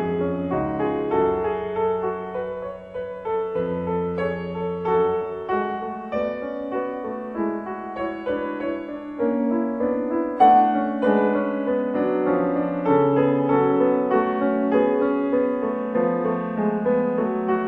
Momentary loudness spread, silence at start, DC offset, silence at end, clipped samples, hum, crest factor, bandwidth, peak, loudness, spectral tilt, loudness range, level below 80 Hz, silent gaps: 10 LU; 0 s; under 0.1%; 0 s; under 0.1%; none; 18 dB; 4.8 kHz; -4 dBFS; -23 LUFS; -9.5 dB/octave; 7 LU; -54 dBFS; none